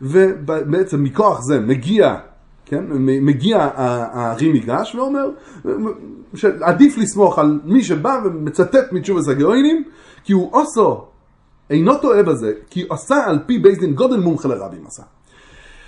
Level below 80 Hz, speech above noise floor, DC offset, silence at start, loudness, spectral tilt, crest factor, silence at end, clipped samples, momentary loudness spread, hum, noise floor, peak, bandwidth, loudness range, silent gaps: -52 dBFS; 37 dB; under 0.1%; 0 s; -16 LUFS; -6.5 dB/octave; 16 dB; 0.85 s; under 0.1%; 12 LU; none; -52 dBFS; 0 dBFS; 11.5 kHz; 3 LU; none